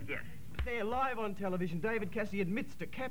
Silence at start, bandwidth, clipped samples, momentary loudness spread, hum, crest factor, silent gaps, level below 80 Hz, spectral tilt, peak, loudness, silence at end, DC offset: 0 s; over 20 kHz; under 0.1%; 8 LU; none; 14 dB; none; -50 dBFS; -7 dB/octave; -22 dBFS; -37 LUFS; 0 s; 0.9%